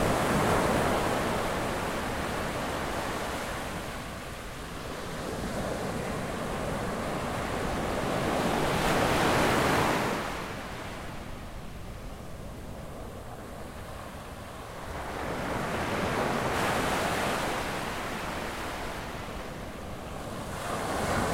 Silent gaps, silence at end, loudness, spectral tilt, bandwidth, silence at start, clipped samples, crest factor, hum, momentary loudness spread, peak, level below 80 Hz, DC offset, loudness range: none; 0 s; -31 LUFS; -4.5 dB/octave; 16 kHz; 0 s; under 0.1%; 18 dB; none; 16 LU; -14 dBFS; -44 dBFS; under 0.1%; 13 LU